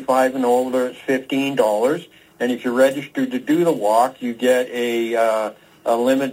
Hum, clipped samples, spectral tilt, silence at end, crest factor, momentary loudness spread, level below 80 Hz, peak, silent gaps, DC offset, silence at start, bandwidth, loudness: none; under 0.1%; -4.5 dB/octave; 0 s; 16 dB; 7 LU; -70 dBFS; -4 dBFS; none; under 0.1%; 0 s; 16 kHz; -19 LUFS